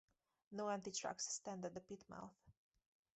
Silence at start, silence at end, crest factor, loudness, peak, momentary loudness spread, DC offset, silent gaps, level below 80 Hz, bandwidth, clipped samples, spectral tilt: 0.5 s; 0.65 s; 20 dB; -48 LUFS; -32 dBFS; 12 LU; under 0.1%; none; -82 dBFS; 8.2 kHz; under 0.1%; -3 dB/octave